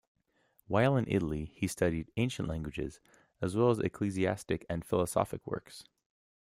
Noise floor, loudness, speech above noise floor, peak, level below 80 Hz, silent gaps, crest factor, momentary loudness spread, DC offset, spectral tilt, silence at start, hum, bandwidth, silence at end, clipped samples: -72 dBFS; -33 LUFS; 40 dB; -12 dBFS; -56 dBFS; none; 22 dB; 12 LU; under 0.1%; -6.5 dB/octave; 0.7 s; none; 15.5 kHz; 0.7 s; under 0.1%